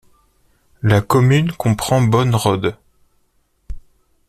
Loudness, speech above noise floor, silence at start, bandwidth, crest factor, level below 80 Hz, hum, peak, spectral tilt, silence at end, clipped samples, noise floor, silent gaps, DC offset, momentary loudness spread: -16 LUFS; 47 dB; 0.85 s; 14 kHz; 16 dB; -40 dBFS; none; -2 dBFS; -6.5 dB/octave; 0.5 s; under 0.1%; -62 dBFS; none; under 0.1%; 7 LU